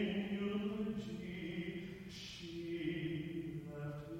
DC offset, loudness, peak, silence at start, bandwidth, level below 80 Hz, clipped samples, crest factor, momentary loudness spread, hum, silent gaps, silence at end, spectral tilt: under 0.1%; -43 LUFS; -26 dBFS; 0 s; 16 kHz; -64 dBFS; under 0.1%; 16 dB; 8 LU; none; none; 0 s; -6.5 dB/octave